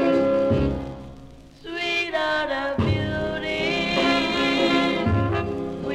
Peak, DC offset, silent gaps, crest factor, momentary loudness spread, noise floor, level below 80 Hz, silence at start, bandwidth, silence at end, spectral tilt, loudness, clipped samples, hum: -8 dBFS; under 0.1%; none; 14 dB; 11 LU; -44 dBFS; -40 dBFS; 0 s; 12 kHz; 0 s; -6 dB/octave; -23 LUFS; under 0.1%; none